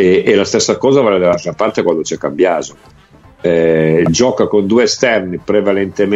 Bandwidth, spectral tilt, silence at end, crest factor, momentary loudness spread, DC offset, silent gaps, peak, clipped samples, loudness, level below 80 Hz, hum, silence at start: 8.2 kHz; -5 dB/octave; 0 s; 12 dB; 6 LU; under 0.1%; none; 0 dBFS; under 0.1%; -13 LUFS; -46 dBFS; none; 0 s